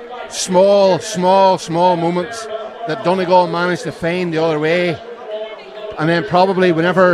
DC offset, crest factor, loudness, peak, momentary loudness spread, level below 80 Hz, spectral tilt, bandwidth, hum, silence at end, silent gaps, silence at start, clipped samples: under 0.1%; 14 dB; -15 LUFS; 0 dBFS; 15 LU; -56 dBFS; -5 dB/octave; 12.5 kHz; none; 0 s; none; 0 s; under 0.1%